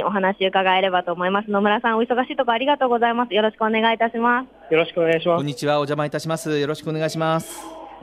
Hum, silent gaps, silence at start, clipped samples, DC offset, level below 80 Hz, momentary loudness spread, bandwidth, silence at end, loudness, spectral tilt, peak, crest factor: none; none; 0 s; under 0.1%; under 0.1%; -64 dBFS; 6 LU; 15.5 kHz; 0 s; -20 LUFS; -5 dB/octave; -6 dBFS; 14 dB